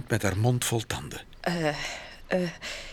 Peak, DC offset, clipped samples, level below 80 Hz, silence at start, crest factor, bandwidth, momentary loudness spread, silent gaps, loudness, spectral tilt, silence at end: -10 dBFS; under 0.1%; under 0.1%; -50 dBFS; 0 s; 20 dB; 19 kHz; 10 LU; none; -29 LUFS; -4.5 dB/octave; 0 s